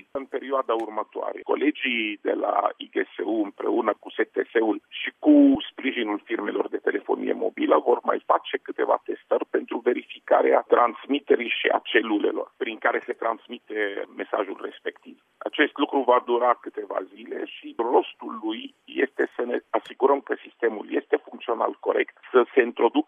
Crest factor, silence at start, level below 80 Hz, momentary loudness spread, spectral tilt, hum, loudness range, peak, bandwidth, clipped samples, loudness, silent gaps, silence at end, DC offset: 18 dB; 0.15 s; -74 dBFS; 12 LU; -6 dB/octave; none; 4 LU; -6 dBFS; 3.7 kHz; under 0.1%; -25 LUFS; none; 0.05 s; under 0.1%